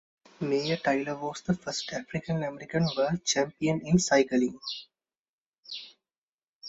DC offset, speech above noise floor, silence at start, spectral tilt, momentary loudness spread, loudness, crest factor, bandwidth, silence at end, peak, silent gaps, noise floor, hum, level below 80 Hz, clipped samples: under 0.1%; over 62 dB; 0.4 s; -4.5 dB/octave; 16 LU; -29 LUFS; 20 dB; 8 kHz; 0 s; -10 dBFS; 5.19-5.52 s, 5.58-5.63 s, 6.18-6.61 s; under -90 dBFS; none; -60 dBFS; under 0.1%